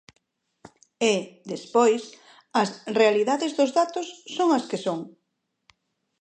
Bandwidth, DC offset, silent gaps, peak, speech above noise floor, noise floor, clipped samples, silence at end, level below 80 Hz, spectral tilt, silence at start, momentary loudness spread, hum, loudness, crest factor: 9.4 kHz; under 0.1%; none; -6 dBFS; 54 dB; -78 dBFS; under 0.1%; 1.1 s; -78 dBFS; -4 dB/octave; 1 s; 14 LU; none; -24 LUFS; 20 dB